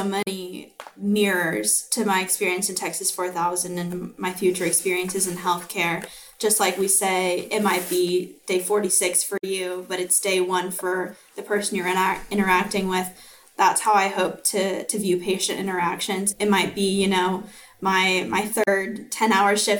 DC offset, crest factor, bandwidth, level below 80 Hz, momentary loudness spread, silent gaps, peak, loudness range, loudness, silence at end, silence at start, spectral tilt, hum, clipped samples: under 0.1%; 18 dB; 19.5 kHz; -58 dBFS; 9 LU; none; -6 dBFS; 2 LU; -22 LUFS; 0 s; 0 s; -3 dB/octave; none; under 0.1%